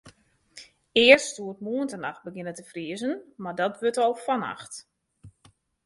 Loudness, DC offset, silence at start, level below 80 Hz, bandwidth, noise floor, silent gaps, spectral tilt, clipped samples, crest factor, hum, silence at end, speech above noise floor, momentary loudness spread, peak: -24 LUFS; under 0.1%; 0.05 s; -68 dBFS; 11.5 kHz; -61 dBFS; none; -3 dB/octave; under 0.1%; 26 dB; none; 0.55 s; 36 dB; 20 LU; -2 dBFS